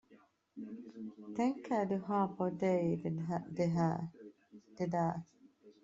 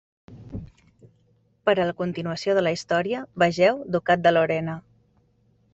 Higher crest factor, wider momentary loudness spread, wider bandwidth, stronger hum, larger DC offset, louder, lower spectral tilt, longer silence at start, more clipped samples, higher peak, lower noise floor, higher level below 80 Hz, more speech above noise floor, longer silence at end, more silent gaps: about the same, 18 dB vs 20 dB; second, 15 LU vs 19 LU; about the same, 7.6 kHz vs 8.2 kHz; neither; neither; second, -36 LUFS vs -23 LUFS; first, -8.5 dB/octave vs -6 dB/octave; second, 0.1 s vs 0.3 s; neither; second, -20 dBFS vs -6 dBFS; about the same, -66 dBFS vs -63 dBFS; second, -74 dBFS vs -56 dBFS; second, 31 dB vs 41 dB; second, 0.15 s vs 0.95 s; neither